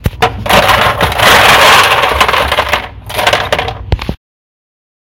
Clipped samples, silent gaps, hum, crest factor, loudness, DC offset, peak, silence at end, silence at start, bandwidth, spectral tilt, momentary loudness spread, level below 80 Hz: 2%; none; none; 10 dB; -8 LUFS; under 0.1%; 0 dBFS; 1 s; 0.05 s; over 20 kHz; -3 dB/octave; 14 LU; -26 dBFS